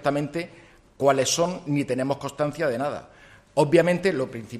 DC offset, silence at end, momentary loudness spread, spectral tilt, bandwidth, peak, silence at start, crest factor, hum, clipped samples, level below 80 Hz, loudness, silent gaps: under 0.1%; 0 s; 11 LU; -5 dB/octave; 13.5 kHz; -6 dBFS; 0 s; 18 dB; none; under 0.1%; -58 dBFS; -24 LUFS; none